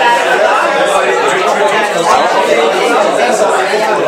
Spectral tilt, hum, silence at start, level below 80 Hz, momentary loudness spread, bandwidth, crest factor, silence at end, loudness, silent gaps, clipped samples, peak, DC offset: -2.5 dB/octave; none; 0 s; -58 dBFS; 1 LU; 16.5 kHz; 10 dB; 0 s; -10 LUFS; none; under 0.1%; 0 dBFS; under 0.1%